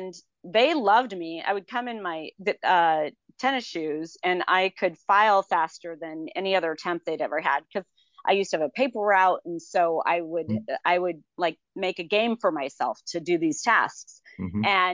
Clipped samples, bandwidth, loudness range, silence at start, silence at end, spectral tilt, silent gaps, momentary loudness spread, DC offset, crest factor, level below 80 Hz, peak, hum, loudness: under 0.1%; 7.6 kHz; 2 LU; 0 s; 0 s; -4 dB/octave; none; 12 LU; under 0.1%; 18 dB; -64 dBFS; -8 dBFS; none; -25 LUFS